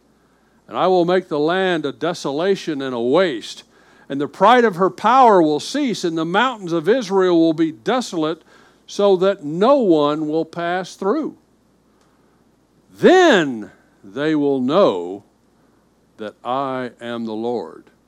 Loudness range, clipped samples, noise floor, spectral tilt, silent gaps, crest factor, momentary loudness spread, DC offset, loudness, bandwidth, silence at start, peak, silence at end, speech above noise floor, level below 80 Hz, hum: 6 LU; under 0.1%; -57 dBFS; -5.5 dB/octave; none; 18 dB; 17 LU; under 0.1%; -18 LUFS; 12.5 kHz; 0.7 s; 0 dBFS; 0.35 s; 40 dB; -68 dBFS; none